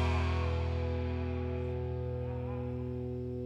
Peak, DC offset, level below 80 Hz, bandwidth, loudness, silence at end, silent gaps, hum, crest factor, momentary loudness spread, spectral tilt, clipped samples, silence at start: -20 dBFS; under 0.1%; -40 dBFS; 7.6 kHz; -36 LUFS; 0 s; none; none; 14 dB; 6 LU; -8 dB/octave; under 0.1%; 0 s